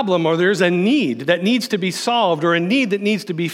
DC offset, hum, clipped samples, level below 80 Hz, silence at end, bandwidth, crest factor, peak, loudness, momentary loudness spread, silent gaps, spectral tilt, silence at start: under 0.1%; none; under 0.1%; -78 dBFS; 0 s; 16 kHz; 14 dB; -2 dBFS; -17 LUFS; 4 LU; none; -5 dB/octave; 0 s